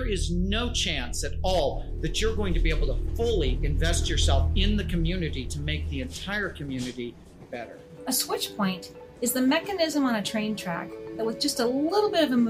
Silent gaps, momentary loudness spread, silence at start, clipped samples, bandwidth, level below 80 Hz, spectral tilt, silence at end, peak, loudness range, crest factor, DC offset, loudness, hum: none; 10 LU; 0 s; under 0.1%; 15.5 kHz; -32 dBFS; -4.5 dB/octave; 0 s; -10 dBFS; 5 LU; 16 dB; under 0.1%; -27 LUFS; none